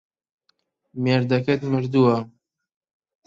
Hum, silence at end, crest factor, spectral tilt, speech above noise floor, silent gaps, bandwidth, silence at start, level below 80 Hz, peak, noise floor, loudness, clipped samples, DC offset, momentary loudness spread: none; 1 s; 18 dB; -8.5 dB/octave; 50 dB; none; 7.4 kHz; 0.95 s; -62 dBFS; -6 dBFS; -70 dBFS; -21 LUFS; under 0.1%; under 0.1%; 13 LU